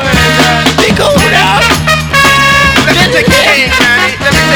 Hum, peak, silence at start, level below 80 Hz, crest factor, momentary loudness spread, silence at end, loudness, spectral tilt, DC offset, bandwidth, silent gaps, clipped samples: none; 0 dBFS; 0 s; -24 dBFS; 8 dB; 3 LU; 0 s; -6 LUFS; -3.5 dB/octave; under 0.1%; over 20 kHz; none; 3%